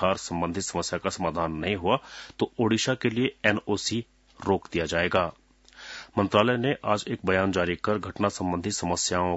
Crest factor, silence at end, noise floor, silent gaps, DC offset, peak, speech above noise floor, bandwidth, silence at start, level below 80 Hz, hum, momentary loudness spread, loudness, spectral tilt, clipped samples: 22 dB; 0 s; -48 dBFS; none; under 0.1%; -6 dBFS; 21 dB; 8 kHz; 0 s; -56 dBFS; none; 7 LU; -27 LUFS; -4.5 dB/octave; under 0.1%